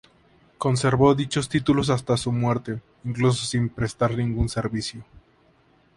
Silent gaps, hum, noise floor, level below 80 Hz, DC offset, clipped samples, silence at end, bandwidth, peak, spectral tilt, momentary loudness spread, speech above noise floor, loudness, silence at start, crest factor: none; none; -60 dBFS; -42 dBFS; under 0.1%; under 0.1%; 0.95 s; 11.5 kHz; -4 dBFS; -6 dB/octave; 12 LU; 37 dB; -24 LUFS; 0.6 s; 20 dB